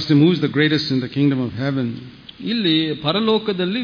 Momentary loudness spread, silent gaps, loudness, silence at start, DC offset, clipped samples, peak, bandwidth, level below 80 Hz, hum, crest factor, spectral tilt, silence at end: 10 LU; none; -19 LUFS; 0 s; under 0.1%; under 0.1%; -4 dBFS; 5.2 kHz; -56 dBFS; none; 16 dB; -7.5 dB/octave; 0 s